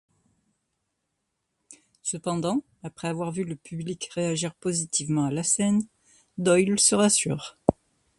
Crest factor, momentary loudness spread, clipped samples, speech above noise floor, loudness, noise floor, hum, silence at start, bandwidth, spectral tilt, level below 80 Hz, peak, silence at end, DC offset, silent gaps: 26 dB; 14 LU; under 0.1%; 54 dB; -25 LUFS; -79 dBFS; none; 1.7 s; 11.5 kHz; -4 dB/octave; -58 dBFS; 0 dBFS; 0.45 s; under 0.1%; none